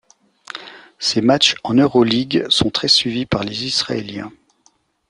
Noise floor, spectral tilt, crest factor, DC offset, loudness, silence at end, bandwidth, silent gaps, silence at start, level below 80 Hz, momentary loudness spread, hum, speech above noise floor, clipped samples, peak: -59 dBFS; -4 dB/octave; 18 dB; under 0.1%; -16 LUFS; 0.8 s; 11 kHz; none; 0.55 s; -50 dBFS; 19 LU; none; 42 dB; under 0.1%; 0 dBFS